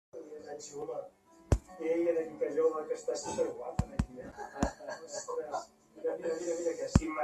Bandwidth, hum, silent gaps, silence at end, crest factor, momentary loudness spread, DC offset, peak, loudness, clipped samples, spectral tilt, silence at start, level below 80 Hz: 13 kHz; none; none; 0 s; 28 dB; 14 LU; under 0.1%; -8 dBFS; -35 LUFS; under 0.1%; -6 dB/octave; 0.15 s; -44 dBFS